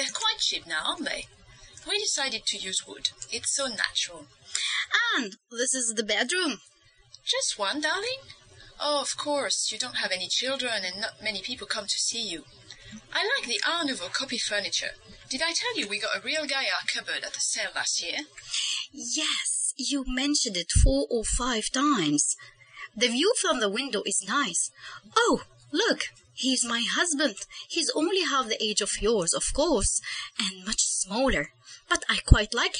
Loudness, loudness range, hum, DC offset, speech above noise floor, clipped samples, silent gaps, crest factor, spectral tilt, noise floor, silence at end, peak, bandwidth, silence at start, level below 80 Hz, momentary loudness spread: -27 LUFS; 3 LU; none; under 0.1%; 28 dB; under 0.1%; none; 28 dB; -2 dB/octave; -56 dBFS; 0 s; 0 dBFS; 10 kHz; 0 s; -38 dBFS; 8 LU